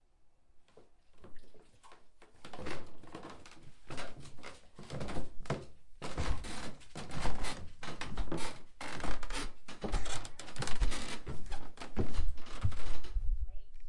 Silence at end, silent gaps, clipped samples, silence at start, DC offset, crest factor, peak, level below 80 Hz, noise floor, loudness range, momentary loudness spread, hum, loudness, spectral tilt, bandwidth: 0 s; none; under 0.1%; 0.55 s; under 0.1%; 14 dB; -16 dBFS; -42 dBFS; -62 dBFS; 9 LU; 17 LU; none; -43 LUFS; -4.5 dB/octave; 11.5 kHz